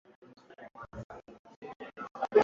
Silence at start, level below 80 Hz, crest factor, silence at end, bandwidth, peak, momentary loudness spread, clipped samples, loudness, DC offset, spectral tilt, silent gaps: 0.5 s; -66 dBFS; 24 dB; 0 s; 6.8 kHz; -12 dBFS; 17 LU; under 0.1%; -39 LUFS; under 0.1%; -4.5 dB/octave; 1.04-1.10 s, 1.39-1.44 s, 1.56-1.62 s, 1.76-1.80 s, 2.11-2.15 s